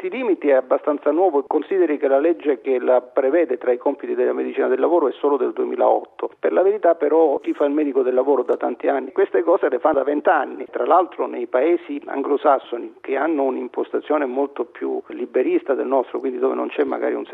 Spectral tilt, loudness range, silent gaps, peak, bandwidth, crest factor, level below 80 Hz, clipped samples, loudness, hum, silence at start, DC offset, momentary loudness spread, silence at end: -7.5 dB/octave; 3 LU; none; -4 dBFS; 4 kHz; 16 dB; -72 dBFS; under 0.1%; -20 LUFS; none; 0 s; under 0.1%; 8 LU; 0 s